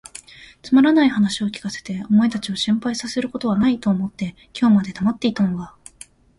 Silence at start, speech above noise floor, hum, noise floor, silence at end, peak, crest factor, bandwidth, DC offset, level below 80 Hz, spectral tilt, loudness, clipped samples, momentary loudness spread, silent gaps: 0.4 s; 27 dB; none; -46 dBFS; 0.7 s; -4 dBFS; 16 dB; 11.5 kHz; under 0.1%; -54 dBFS; -5.5 dB/octave; -20 LUFS; under 0.1%; 14 LU; none